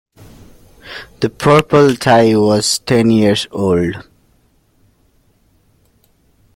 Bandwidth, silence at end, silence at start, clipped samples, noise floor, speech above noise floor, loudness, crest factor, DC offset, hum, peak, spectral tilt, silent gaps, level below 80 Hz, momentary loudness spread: 16.5 kHz; 2.55 s; 0.85 s; under 0.1%; -55 dBFS; 44 dB; -13 LUFS; 16 dB; under 0.1%; none; 0 dBFS; -5 dB/octave; none; -46 dBFS; 18 LU